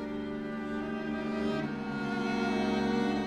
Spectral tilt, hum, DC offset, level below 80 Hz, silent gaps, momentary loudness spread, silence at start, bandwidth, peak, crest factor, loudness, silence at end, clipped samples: -6 dB/octave; none; under 0.1%; -56 dBFS; none; 7 LU; 0 s; 10 kHz; -18 dBFS; 14 dB; -33 LUFS; 0 s; under 0.1%